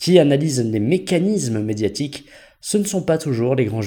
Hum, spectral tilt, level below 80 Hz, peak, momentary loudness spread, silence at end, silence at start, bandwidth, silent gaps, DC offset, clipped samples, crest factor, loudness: none; -5.5 dB/octave; -54 dBFS; 0 dBFS; 10 LU; 0 s; 0 s; 19 kHz; none; under 0.1%; under 0.1%; 18 dB; -19 LUFS